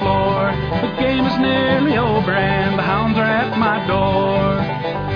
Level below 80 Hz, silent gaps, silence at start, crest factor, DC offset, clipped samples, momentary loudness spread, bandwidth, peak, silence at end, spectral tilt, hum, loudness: -36 dBFS; none; 0 s; 12 dB; under 0.1%; under 0.1%; 4 LU; 5.4 kHz; -4 dBFS; 0 s; -8.5 dB/octave; none; -17 LUFS